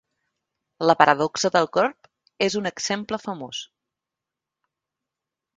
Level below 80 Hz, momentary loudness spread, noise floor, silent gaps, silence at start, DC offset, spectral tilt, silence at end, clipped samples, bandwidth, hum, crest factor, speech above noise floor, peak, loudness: -66 dBFS; 14 LU; -87 dBFS; none; 0.8 s; under 0.1%; -3.5 dB/octave; 1.95 s; under 0.1%; 9.6 kHz; none; 26 dB; 65 dB; 0 dBFS; -22 LUFS